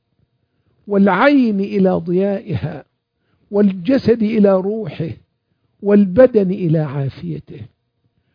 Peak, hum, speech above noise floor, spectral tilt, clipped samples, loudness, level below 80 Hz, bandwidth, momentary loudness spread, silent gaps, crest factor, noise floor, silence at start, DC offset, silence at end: 0 dBFS; none; 51 dB; -10 dB/octave; under 0.1%; -16 LUFS; -52 dBFS; 5.2 kHz; 17 LU; none; 16 dB; -66 dBFS; 0.85 s; under 0.1%; 0.7 s